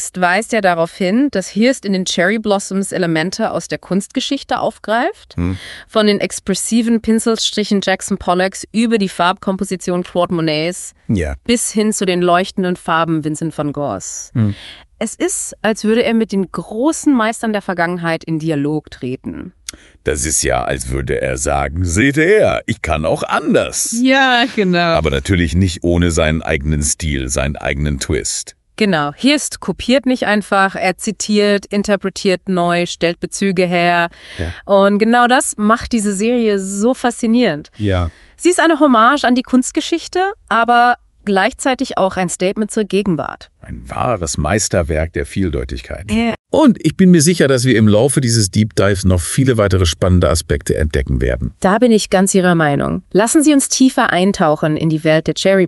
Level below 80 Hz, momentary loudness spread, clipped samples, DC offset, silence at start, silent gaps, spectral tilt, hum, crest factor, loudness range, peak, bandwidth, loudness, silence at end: -32 dBFS; 9 LU; under 0.1%; under 0.1%; 0 s; 46.39-46.44 s; -4.5 dB/octave; none; 14 dB; 5 LU; 0 dBFS; 12 kHz; -15 LUFS; 0 s